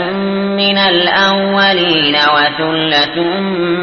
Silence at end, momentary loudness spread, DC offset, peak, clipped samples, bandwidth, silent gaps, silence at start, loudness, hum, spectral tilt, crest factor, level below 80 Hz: 0 s; 6 LU; under 0.1%; 0 dBFS; under 0.1%; 6.6 kHz; none; 0 s; -11 LUFS; none; -5.5 dB/octave; 12 dB; -50 dBFS